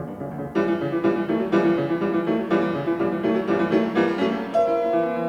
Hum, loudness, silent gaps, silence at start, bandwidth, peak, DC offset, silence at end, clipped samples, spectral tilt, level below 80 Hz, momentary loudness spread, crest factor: none; -23 LUFS; none; 0 s; 7.2 kHz; -8 dBFS; under 0.1%; 0 s; under 0.1%; -8 dB/octave; -58 dBFS; 4 LU; 14 dB